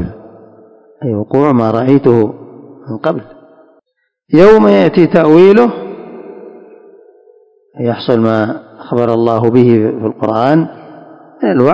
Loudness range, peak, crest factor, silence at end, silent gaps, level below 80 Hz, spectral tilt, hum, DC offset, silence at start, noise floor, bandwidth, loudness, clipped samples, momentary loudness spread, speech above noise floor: 6 LU; 0 dBFS; 12 dB; 0 s; none; -46 dBFS; -9 dB/octave; none; under 0.1%; 0 s; -60 dBFS; 8 kHz; -10 LUFS; 2%; 19 LU; 51 dB